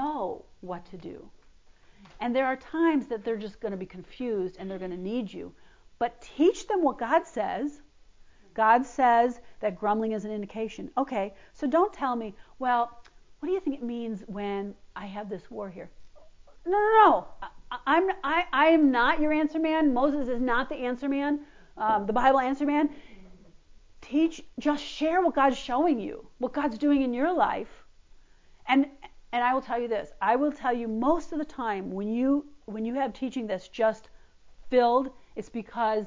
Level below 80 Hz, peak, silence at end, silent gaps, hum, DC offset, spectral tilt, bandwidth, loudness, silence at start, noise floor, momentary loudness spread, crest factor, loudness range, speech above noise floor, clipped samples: -56 dBFS; -8 dBFS; 0 s; none; none; under 0.1%; -5.5 dB/octave; 7.6 kHz; -27 LUFS; 0 s; -55 dBFS; 16 LU; 20 dB; 7 LU; 28 dB; under 0.1%